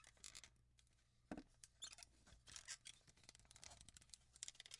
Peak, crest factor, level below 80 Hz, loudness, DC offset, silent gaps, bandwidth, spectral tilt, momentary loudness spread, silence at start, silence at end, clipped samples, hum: -30 dBFS; 32 dB; -76 dBFS; -59 LUFS; under 0.1%; none; 12 kHz; -1.5 dB/octave; 11 LU; 0 s; 0 s; under 0.1%; none